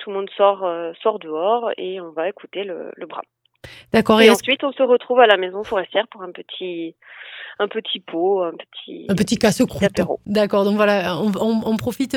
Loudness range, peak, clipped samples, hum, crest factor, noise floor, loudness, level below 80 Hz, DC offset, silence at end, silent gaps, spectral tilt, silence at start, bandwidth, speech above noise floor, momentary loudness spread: 8 LU; 0 dBFS; under 0.1%; none; 20 dB; -43 dBFS; -19 LUFS; -54 dBFS; under 0.1%; 0 s; none; -5 dB/octave; 0 s; 17.5 kHz; 24 dB; 19 LU